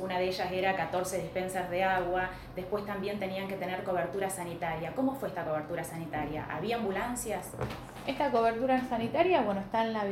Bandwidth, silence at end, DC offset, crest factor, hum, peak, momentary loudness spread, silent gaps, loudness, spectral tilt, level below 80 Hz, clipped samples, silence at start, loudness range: 16.5 kHz; 0 s; under 0.1%; 20 dB; none; -12 dBFS; 9 LU; none; -32 LUFS; -5 dB/octave; -56 dBFS; under 0.1%; 0 s; 4 LU